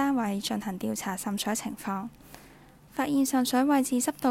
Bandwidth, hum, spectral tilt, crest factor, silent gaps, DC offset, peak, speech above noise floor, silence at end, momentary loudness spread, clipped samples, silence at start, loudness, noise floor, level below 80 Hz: 16 kHz; none; -4 dB/octave; 16 dB; none; under 0.1%; -12 dBFS; 25 dB; 0 s; 10 LU; under 0.1%; 0 s; -28 LUFS; -53 dBFS; -62 dBFS